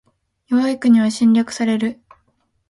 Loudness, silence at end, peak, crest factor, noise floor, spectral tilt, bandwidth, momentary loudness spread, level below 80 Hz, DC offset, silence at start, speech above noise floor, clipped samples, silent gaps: -17 LUFS; 0.75 s; -4 dBFS; 14 dB; -65 dBFS; -5.5 dB/octave; 11.5 kHz; 7 LU; -62 dBFS; under 0.1%; 0.5 s; 49 dB; under 0.1%; none